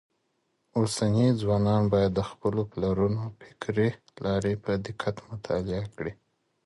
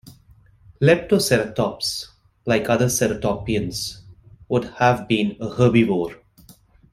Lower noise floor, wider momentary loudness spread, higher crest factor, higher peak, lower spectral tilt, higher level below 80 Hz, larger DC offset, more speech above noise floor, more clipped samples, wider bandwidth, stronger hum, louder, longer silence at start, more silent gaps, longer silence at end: first, -75 dBFS vs -52 dBFS; about the same, 11 LU vs 11 LU; about the same, 16 dB vs 20 dB; second, -12 dBFS vs -2 dBFS; first, -7 dB/octave vs -5 dB/octave; about the same, -50 dBFS vs -48 dBFS; neither; first, 48 dB vs 33 dB; neither; second, 11.5 kHz vs 16 kHz; neither; second, -28 LUFS vs -21 LUFS; about the same, 0.75 s vs 0.8 s; neither; second, 0.55 s vs 0.8 s